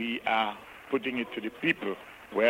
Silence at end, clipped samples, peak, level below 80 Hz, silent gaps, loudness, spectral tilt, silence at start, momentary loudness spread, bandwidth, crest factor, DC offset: 0 s; under 0.1%; -10 dBFS; -68 dBFS; none; -31 LUFS; -5.5 dB/octave; 0 s; 9 LU; 16 kHz; 20 dB; under 0.1%